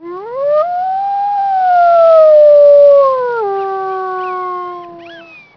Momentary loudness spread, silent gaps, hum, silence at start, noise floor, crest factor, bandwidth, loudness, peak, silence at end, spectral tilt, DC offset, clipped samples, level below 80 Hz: 15 LU; none; none; 0 s; -35 dBFS; 10 dB; 5.4 kHz; -10 LUFS; 0 dBFS; 0.35 s; -6 dB/octave; under 0.1%; under 0.1%; -62 dBFS